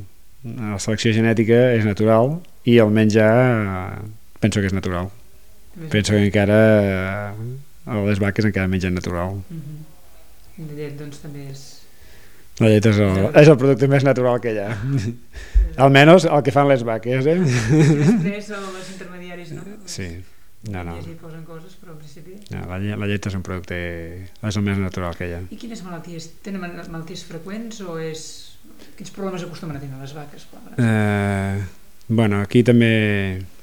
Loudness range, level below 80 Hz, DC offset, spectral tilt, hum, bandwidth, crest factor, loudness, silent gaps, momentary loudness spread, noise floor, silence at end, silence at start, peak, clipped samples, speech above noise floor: 16 LU; -38 dBFS; 1%; -6.5 dB/octave; none; 18 kHz; 20 dB; -18 LUFS; none; 21 LU; -50 dBFS; 0.15 s; 0 s; 0 dBFS; under 0.1%; 31 dB